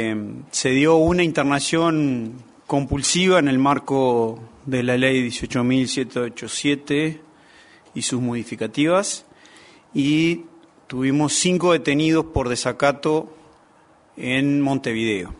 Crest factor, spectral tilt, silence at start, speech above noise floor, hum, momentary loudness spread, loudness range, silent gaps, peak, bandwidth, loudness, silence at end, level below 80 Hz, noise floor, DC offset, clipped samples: 18 dB; -4.5 dB/octave; 0 s; 34 dB; none; 11 LU; 4 LU; none; -2 dBFS; 11 kHz; -20 LUFS; 0.05 s; -46 dBFS; -54 dBFS; under 0.1%; under 0.1%